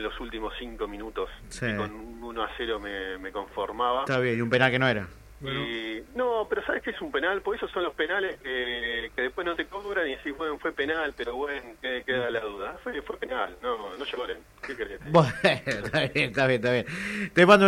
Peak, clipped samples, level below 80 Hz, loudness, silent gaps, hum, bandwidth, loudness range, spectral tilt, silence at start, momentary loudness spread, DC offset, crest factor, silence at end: -6 dBFS; under 0.1%; -52 dBFS; -28 LUFS; none; none; 16 kHz; 6 LU; -5.5 dB/octave; 0 s; 12 LU; under 0.1%; 22 dB; 0 s